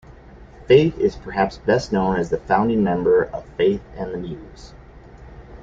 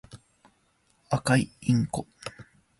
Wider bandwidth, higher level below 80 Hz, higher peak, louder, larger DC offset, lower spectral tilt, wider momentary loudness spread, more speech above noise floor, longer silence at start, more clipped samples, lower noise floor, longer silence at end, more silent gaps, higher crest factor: second, 7.6 kHz vs 11.5 kHz; first, -42 dBFS vs -56 dBFS; first, -2 dBFS vs -10 dBFS; first, -20 LUFS vs -27 LUFS; neither; about the same, -7 dB/octave vs -6 dB/octave; second, 14 LU vs 17 LU; second, 23 dB vs 42 dB; first, 0.35 s vs 0.15 s; neither; second, -43 dBFS vs -68 dBFS; second, 0 s vs 0.35 s; neither; about the same, 18 dB vs 20 dB